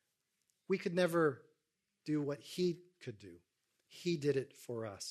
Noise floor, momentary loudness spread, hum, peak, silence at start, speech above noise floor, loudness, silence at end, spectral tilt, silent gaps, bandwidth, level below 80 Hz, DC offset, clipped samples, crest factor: -86 dBFS; 18 LU; none; -20 dBFS; 0.7 s; 49 dB; -37 LUFS; 0 s; -6 dB/octave; none; 13.5 kHz; -82 dBFS; under 0.1%; under 0.1%; 20 dB